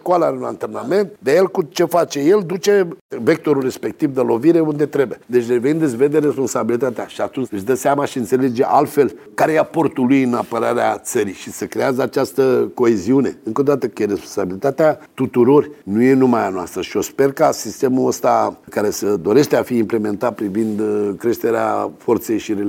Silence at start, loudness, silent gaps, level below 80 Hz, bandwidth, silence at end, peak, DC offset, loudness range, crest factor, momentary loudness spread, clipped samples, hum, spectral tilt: 0.05 s; -17 LUFS; 3.01-3.09 s; -62 dBFS; 17 kHz; 0 s; -2 dBFS; under 0.1%; 2 LU; 16 dB; 7 LU; under 0.1%; none; -6 dB/octave